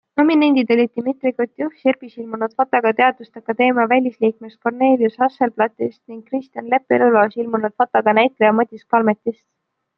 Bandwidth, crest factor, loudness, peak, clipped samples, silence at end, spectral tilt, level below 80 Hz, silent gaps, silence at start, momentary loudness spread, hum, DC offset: 5.6 kHz; 16 dB; -18 LUFS; -2 dBFS; under 0.1%; 0.65 s; -8.5 dB/octave; -70 dBFS; none; 0.15 s; 12 LU; none; under 0.1%